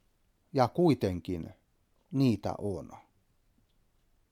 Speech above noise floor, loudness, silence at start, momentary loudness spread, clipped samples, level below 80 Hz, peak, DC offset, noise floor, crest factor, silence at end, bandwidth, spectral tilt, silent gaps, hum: 41 dB; -31 LUFS; 0.55 s; 15 LU; under 0.1%; -62 dBFS; -10 dBFS; under 0.1%; -71 dBFS; 22 dB; 1.35 s; 15.5 kHz; -8 dB/octave; none; none